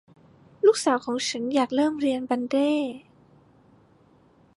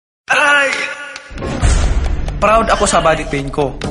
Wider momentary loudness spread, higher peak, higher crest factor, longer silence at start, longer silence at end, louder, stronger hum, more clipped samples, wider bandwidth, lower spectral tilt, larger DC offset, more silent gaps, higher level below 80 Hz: second, 7 LU vs 12 LU; second, -8 dBFS vs 0 dBFS; about the same, 18 dB vs 14 dB; first, 0.65 s vs 0.3 s; first, 1.6 s vs 0 s; second, -24 LUFS vs -14 LUFS; neither; neither; about the same, 11.5 kHz vs 11.5 kHz; about the same, -3.5 dB/octave vs -4 dB/octave; neither; neither; second, -70 dBFS vs -20 dBFS